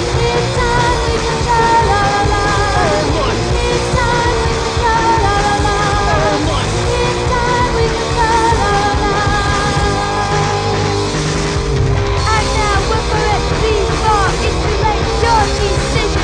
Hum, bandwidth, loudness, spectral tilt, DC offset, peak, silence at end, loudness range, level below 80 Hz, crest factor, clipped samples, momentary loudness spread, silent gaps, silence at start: none; 10 kHz; -14 LUFS; -4.5 dB/octave; under 0.1%; 0 dBFS; 0 s; 2 LU; -22 dBFS; 14 dB; under 0.1%; 3 LU; none; 0 s